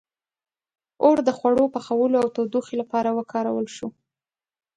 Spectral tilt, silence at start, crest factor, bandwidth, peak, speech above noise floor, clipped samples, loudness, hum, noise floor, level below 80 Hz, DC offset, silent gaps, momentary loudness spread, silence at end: -6 dB/octave; 1 s; 20 dB; 10 kHz; -4 dBFS; over 68 dB; under 0.1%; -22 LUFS; none; under -90 dBFS; -66 dBFS; under 0.1%; none; 9 LU; 0.85 s